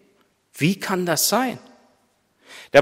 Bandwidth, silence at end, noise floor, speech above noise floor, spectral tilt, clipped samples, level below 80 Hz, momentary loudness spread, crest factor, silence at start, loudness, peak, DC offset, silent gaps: 16 kHz; 0 s; -64 dBFS; 43 dB; -3.5 dB/octave; under 0.1%; -68 dBFS; 16 LU; 22 dB; 0.55 s; -21 LUFS; 0 dBFS; under 0.1%; none